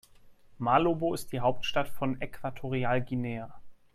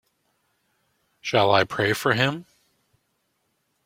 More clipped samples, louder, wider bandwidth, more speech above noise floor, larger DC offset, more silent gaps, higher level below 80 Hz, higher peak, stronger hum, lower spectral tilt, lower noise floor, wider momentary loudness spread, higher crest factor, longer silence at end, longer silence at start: neither; second, -31 LUFS vs -22 LUFS; about the same, 15 kHz vs 16.5 kHz; second, 26 dB vs 51 dB; neither; neither; first, -54 dBFS vs -62 dBFS; second, -10 dBFS vs -4 dBFS; neither; first, -6 dB/octave vs -4.5 dB/octave; second, -55 dBFS vs -73 dBFS; about the same, 12 LU vs 12 LU; about the same, 20 dB vs 22 dB; second, 0.2 s vs 1.45 s; second, 0.25 s vs 1.25 s